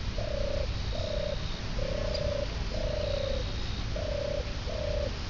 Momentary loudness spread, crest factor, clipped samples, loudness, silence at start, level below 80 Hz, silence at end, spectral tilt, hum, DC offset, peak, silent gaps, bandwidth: 3 LU; 14 dB; under 0.1%; -33 LUFS; 0 s; -36 dBFS; 0 s; -5.5 dB/octave; none; 0.4%; -18 dBFS; none; 6 kHz